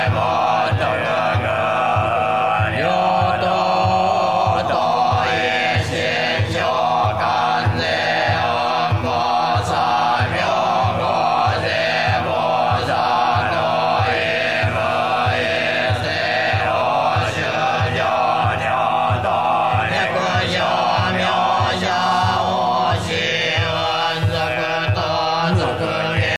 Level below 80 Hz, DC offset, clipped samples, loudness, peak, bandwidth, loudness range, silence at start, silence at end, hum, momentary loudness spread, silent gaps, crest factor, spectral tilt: -46 dBFS; 0.3%; under 0.1%; -18 LUFS; -4 dBFS; 13.5 kHz; 1 LU; 0 s; 0 s; none; 2 LU; none; 12 dB; -5 dB/octave